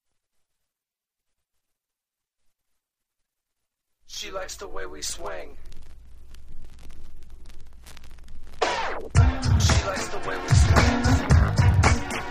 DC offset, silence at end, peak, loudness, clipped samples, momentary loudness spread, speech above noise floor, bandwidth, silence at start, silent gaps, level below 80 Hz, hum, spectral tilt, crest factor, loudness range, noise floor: under 0.1%; 0 s; -4 dBFS; -23 LUFS; under 0.1%; 17 LU; 66 dB; 15.5 kHz; 4.1 s; none; -30 dBFS; none; -5 dB/octave; 22 dB; 19 LU; -89 dBFS